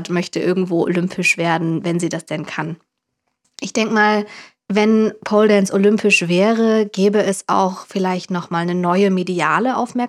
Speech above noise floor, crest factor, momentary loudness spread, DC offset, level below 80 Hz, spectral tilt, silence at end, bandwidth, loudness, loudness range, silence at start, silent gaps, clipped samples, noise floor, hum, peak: 57 dB; 16 dB; 10 LU; under 0.1%; -70 dBFS; -5.5 dB/octave; 0 s; 13 kHz; -17 LUFS; 5 LU; 0 s; none; under 0.1%; -74 dBFS; none; 0 dBFS